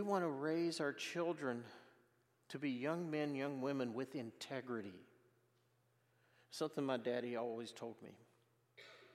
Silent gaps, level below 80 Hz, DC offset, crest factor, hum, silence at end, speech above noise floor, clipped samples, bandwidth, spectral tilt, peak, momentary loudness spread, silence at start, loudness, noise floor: none; under -90 dBFS; under 0.1%; 20 dB; none; 0.05 s; 35 dB; under 0.1%; 15 kHz; -5.5 dB/octave; -24 dBFS; 19 LU; 0 s; -43 LUFS; -78 dBFS